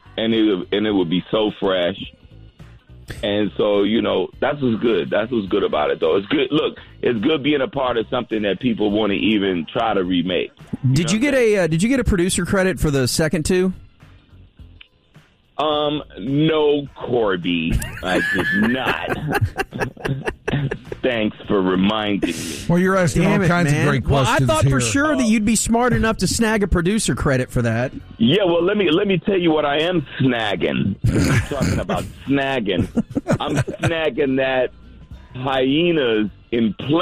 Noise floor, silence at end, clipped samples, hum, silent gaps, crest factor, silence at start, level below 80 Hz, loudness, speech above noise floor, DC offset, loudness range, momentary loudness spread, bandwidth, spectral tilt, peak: -52 dBFS; 0 s; under 0.1%; none; none; 12 dB; 0.15 s; -36 dBFS; -19 LUFS; 33 dB; under 0.1%; 4 LU; 7 LU; 15.5 kHz; -5.5 dB/octave; -8 dBFS